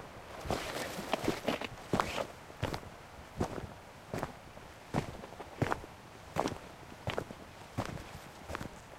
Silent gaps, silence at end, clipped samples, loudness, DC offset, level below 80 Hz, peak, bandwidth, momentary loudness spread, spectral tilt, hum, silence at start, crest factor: none; 0 s; under 0.1%; -39 LUFS; under 0.1%; -54 dBFS; -12 dBFS; 16 kHz; 15 LU; -5 dB/octave; none; 0 s; 28 dB